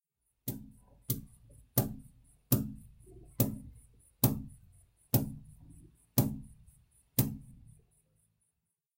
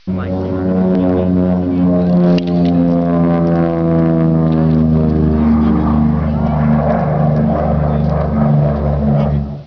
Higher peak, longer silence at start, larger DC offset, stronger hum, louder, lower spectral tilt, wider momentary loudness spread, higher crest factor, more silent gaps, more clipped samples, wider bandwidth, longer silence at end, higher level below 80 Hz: second, -10 dBFS vs -4 dBFS; first, 0.45 s vs 0.05 s; second, under 0.1% vs 0.5%; neither; second, -34 LUFS vs -13 LUFS; second, -5.5 dB/octave vs -11 dB/octave; first, 21 LU vs 3 LU; first, 28 dB vs 10 dB; neither; neither; first, 16 kHz vs 5.4 kHz; first, 1.45 s vs 0 s; second, -56 dBFS vs -26 dBFS